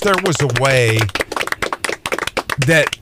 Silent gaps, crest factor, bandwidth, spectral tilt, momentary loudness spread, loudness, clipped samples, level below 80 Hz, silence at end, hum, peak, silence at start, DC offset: none; 16 dB; 16 kHz; -4 dB/octave; 7 LU; -16 LUFS; under 0.1%; -42 dBFS; 0.05 s; none; 0 dBFS; 0 s; under 0.1%